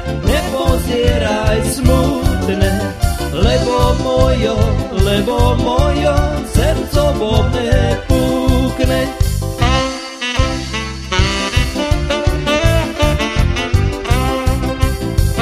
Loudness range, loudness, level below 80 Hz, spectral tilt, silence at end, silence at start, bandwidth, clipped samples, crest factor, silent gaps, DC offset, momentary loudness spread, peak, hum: 2 LU; -15 LUFS; -20 dBFS; -5.5 dB/octave; 0 s; 0 s; 15.5 kHz; under 0.1%; 14 dB; none; under 0.1%; 4 LU; 0 dBFS; none